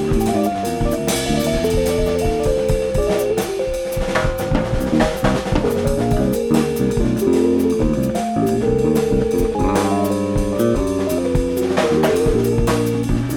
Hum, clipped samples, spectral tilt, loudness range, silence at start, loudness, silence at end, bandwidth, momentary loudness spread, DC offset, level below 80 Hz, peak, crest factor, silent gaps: none; under 0.1%; -6 dB/octave; 2 LU; 0 s; -18 LUFS; 0 s; over 20 kHz; 4 LU; under 0.1%; -28 dBFS; -2 dBFS; 16 dB; none